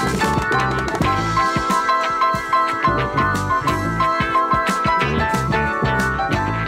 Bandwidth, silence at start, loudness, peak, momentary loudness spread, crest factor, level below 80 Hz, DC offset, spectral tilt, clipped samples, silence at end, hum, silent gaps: 16 kHz; 0 s; -18 LUFS; -6 dBFS; 2 LU; 12 dB; -34 dBFS; under 0.1%; -5 dB/octave; under 0.1%; 0 s; none; none